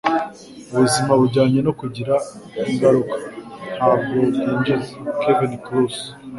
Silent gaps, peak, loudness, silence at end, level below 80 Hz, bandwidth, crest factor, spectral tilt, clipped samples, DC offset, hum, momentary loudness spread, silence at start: none; -2 dBFS; -19 LUFS; 0 s; -54 dBFS; 11.5 kHz; 18 dB; -6 dB/octave; under 0.1%; under 0.1%; none; 14 LU; 0.05 s